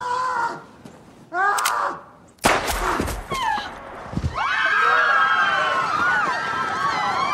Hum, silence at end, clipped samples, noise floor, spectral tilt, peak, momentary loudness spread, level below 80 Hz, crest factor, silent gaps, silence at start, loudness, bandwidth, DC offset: none; 0 s; under 0.1%; -44 dBFS; -3 dB/octave; -4 dBFS; 12 LU; -40 dBFS; 18 dB; none; 0 s; -21 LUFS; 16 kHz; under 0.1%